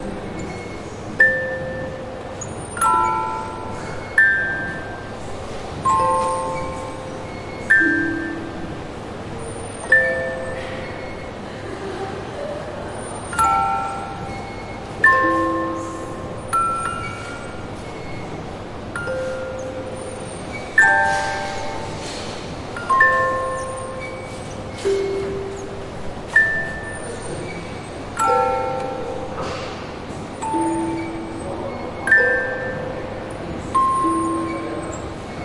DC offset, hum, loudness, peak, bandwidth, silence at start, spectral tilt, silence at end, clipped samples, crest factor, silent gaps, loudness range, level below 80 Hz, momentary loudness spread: under 0.1%; none; -22 LUFS; -2 dBFS; 11.5 kHz; 0 s; -4.5 dB/octave; 0 s; under 0.1%; 20 dB; none; 6 LU; -42 dBFS; 16 LU